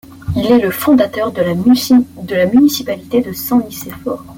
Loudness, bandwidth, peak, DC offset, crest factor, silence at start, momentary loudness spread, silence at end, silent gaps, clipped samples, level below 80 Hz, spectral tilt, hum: -14 LUFS; 17 kHz; 0 dBFS; under 0.1%; 12 dB; 0.1 s; 11 LU; 0 s; none; under 0.1%; -44 dBFS; -5.5 dB/octave; none